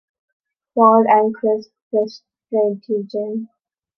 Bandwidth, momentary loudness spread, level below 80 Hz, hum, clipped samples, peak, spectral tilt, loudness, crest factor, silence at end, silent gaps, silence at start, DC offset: 6.2 kHz; 14 LU; -72 dBFS; none; under 0.1%; -2 dBFS; -8 dB/octave; -18 LUFS; 18 dB; 0.55 s; 1.82-1.91 s; 0.75 s; under 0.1%